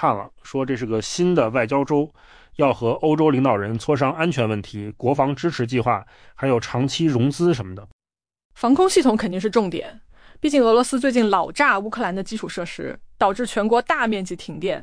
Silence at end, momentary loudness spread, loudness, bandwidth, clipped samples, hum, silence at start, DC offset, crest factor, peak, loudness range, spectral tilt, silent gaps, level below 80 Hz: 0 s; 11 LU; -21 LUFS; 10.5 kHz; under 0.1%; none; 0 s; under 0.1%; 16 dB; -6 dBFS; 3 LU; -5.5 dB/octave; 7.93-7.99 s, 8.45-8.50 s; -50 dBFS